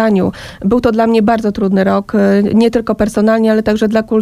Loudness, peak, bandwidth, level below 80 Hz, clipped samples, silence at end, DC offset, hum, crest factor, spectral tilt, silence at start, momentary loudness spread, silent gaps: -12 LUFS; 0 dBFS; 13 kHz; -38 dBFS; under 0.1%; 0 s; under 0.1%; none; 10 dB; -7 dB/octave; 0 s; 4 LU; none